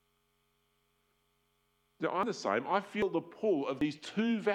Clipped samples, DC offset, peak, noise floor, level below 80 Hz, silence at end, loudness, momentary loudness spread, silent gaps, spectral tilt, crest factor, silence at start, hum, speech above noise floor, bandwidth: under 0.1%; under 0.1%; -16 dBFS; -76 dBFS; -72 dBFS; 0 s; -34 LUFS; 4 LU; none; -5.5 dB/octave; 20 dB; 2 s; none; 43 dB; 11 kHz